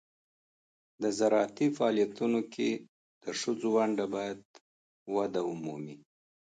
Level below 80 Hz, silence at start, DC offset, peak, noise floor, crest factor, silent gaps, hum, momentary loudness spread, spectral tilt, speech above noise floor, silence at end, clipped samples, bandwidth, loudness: -78 dBFS; 1 s; under 0.1%; -14 dBFS; under -90 dBFS; 18 dB; 2.89-3.21 s, 4.45-4.54 s, 4.61-5.06 s; none; 13 LU; -5 dB/octave; over 59 dB; 0.6 s; under 0.1%; 9.4 kHz; -31 LUFS